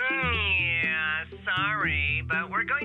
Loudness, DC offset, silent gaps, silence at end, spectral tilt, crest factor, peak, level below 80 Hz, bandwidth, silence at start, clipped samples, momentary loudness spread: -25 LUFS; under 0.1%; none; 0 s; -6.5 dB/octave; 12 dB; -16 dBFS; -44 dBFS; 6.6 kHz; 0 s; under 0.1%; 5 LU